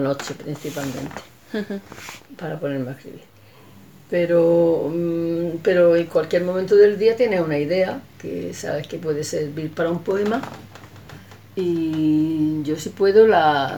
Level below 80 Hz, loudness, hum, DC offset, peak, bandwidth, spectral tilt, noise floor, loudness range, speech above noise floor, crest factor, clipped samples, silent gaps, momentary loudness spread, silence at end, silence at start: -62 dBFS; -20 LUFS; none; 0.2%; -4 dBFS; 19.5 kHz; -6 dB/octave; -47 dBFS; 12 LU; 27 dB; 18 dB; under 0.1%; none; 17 LU; 0 s; 0 s